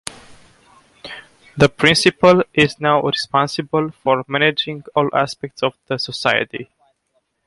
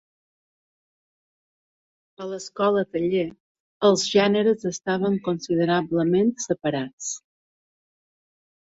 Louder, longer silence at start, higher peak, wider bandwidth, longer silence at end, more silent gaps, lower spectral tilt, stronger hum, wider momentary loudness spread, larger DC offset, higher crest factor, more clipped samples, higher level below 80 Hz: first, -17 LUFS vs -23 LUFS; second, 0.3 s vs 2.2 s; first, 0 dBFS vs -6 dBFS; first, 11.5 kHz vs 8 kHz; second, 0.8 s vs 1.55 s; second, none vs 3.40-3.81 s, 6.93-6.98 s; about the same, -4.5 dB/octave vs -5 dB/octave; neither; first, 20 LU vs 13 LU; neither; about the same, 18 dB vs 20 dB; neither; first, -52 dBFS vs -64 dBFS